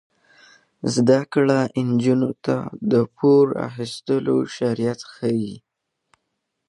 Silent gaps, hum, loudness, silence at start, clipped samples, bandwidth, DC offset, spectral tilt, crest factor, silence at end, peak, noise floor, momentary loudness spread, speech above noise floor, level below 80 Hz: none; none; -21 LUFS; 0.85 s; under 0.1%; 11.5 kHz; under 0.1%; -6.5 dB/octave; 18 dB; 1.1 s; -4 dBFS; -77 dBFS; 10 LU; 57 dB; -64 dBFS